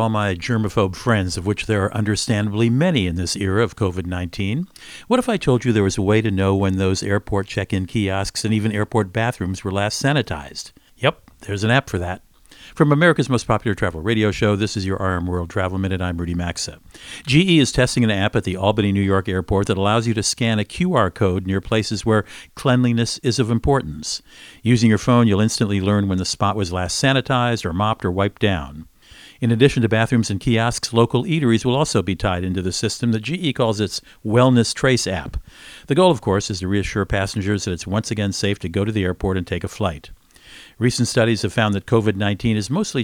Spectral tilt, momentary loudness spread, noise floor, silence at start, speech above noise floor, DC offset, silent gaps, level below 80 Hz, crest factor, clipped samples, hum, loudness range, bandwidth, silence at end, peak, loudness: -5.5 dB/octave; 9 LU; -45 dBFS; 0 s; 26 dB; under 0.1%; none; -40 dBFS; 18 dB; under 0.1%; none; 4 LU; 15.5 kHz; 0 s; 0 dBFS; -20 LUFS